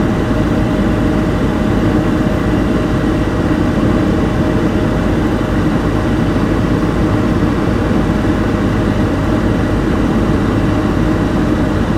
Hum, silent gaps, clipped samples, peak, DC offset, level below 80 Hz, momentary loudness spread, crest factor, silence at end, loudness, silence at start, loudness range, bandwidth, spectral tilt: none; none; under 0.1%; -2 dBFS; under 0.1%; -22 dBFS; 1 LU; 12 dB; 0 s; -14 LUFS; 0 s; 0 LU; 15 kHz; -7.5 dB/octave